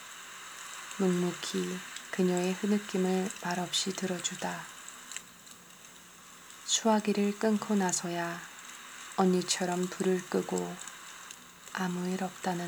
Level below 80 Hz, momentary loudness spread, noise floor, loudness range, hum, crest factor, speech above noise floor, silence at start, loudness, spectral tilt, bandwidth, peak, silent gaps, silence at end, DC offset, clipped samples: -78 dBFS; 18 LU; -53 dBFS; 4 LU; none; 20 dB; 22 dB; 0 s; -32 LUFS; -4 dB/octave; over 20 kHz; -12 dBFS; none; 0 s; under 0.1%; under 0.1%